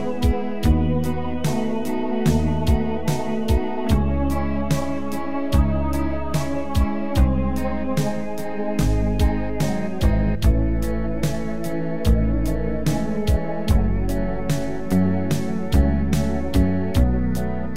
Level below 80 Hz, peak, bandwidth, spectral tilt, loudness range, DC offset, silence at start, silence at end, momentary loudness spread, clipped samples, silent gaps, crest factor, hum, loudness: -26 dBFS; -6 dBFS; 16 kHz; -7 dB/octave; 1 LU; 5%; 0 s; 0 s; 5 LU; under 0.1%; none; 16 dB; none; -23 LUFS